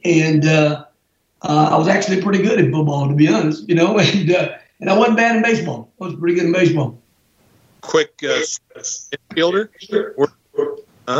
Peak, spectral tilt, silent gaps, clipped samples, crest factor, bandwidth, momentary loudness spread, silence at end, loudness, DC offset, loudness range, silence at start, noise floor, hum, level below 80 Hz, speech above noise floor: -2 dBFS; -5.5 dB/octave; none; under 0.1%; 14 dB; 8 kHz; 12 LU; 0 s; -17 LUFS; under 0.1%; 5 LU; 0.05 s; -65 dBFS; none; -64 dBFS; 49 dB